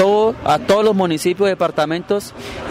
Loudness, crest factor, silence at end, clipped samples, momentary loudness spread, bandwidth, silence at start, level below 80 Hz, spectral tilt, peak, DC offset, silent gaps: -17 LUFS; 12 dB; 0 s; under 0.1%; 8 LU; 16 kHz; 0 s; -46 dBFS; -5.5 dB/octave; -4 dBFS; under 0.1%; none